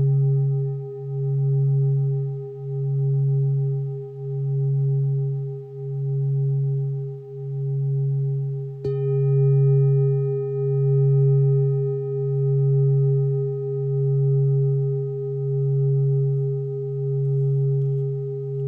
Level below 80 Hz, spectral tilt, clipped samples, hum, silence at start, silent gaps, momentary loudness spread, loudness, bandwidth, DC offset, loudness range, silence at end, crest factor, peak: -68 dBFS; -14 dB/octave; under 0.1%; none; 0 s; none; 10 LU; -23 LUFS; 1.3 kHz; under 0.1%; 5 LU; 0 s; 10 dB; -12 dBFS